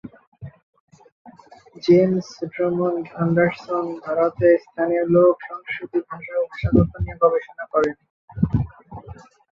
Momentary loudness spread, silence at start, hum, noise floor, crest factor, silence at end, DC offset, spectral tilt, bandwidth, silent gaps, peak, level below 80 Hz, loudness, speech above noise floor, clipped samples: 23 LU; 0.05 s; none; -47 dBFS; 18 dB; 0.45 s; under 0.1%; -8.5 dB/octave; 7 kHz; 0.27-0.32 s, 0.63-0.73 s, 0.80-0.88 s, 1.12-1.25 s, 8.10-8.28 s; -4 dBFS; -42 dBFS; -21 LUFS; 27 dB; under 0.1%